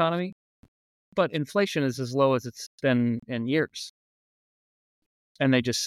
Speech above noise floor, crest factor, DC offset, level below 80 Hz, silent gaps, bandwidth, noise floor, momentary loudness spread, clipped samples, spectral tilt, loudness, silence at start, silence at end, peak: over 64 dB; 18 dB; under 0.1%; -68 dBFS; 0.32-1.12 s, 2.66-2.78 s, 3.89-5.35 s; 14.5 kHz; under -90 dBFS; 10 LU; under 0.1%; -5 dB/octave; -26 LUFS; 0 s; 0 s; -10 dBFS